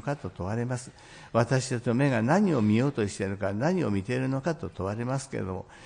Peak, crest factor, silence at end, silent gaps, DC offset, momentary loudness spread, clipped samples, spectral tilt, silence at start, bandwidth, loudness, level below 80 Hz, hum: -12 dBFS; 16 dB; 0 s; none; under 0.1%; 10 LU; under 0.1%; -6.5 dB/octave; 0.05 s; 10.5 kHz; -28 LUFS; -60 dBFS; none